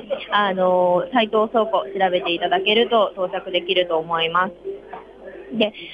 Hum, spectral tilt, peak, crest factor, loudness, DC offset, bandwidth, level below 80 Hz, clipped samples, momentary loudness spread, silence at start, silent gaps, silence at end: none; -6.5 dB/octave; -4 dBFS; 16 dB; -20 LUFS; under 0.1%; 5.2 kHz; -60 dBFS; under 0.1%; 16 LU; 0 s; none; 0 s